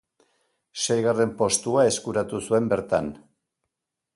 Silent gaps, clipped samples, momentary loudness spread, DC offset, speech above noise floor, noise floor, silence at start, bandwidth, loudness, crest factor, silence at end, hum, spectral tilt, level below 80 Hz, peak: none; under 0.1%; 7 LU; under 0.1%; 61 dB; -84 dBFS; 0.75 s; 11.5 kHz; -23 LUFS; 18 dB; 1 s; none; -4 dB/octave; -58 dBFS; -8 dBFS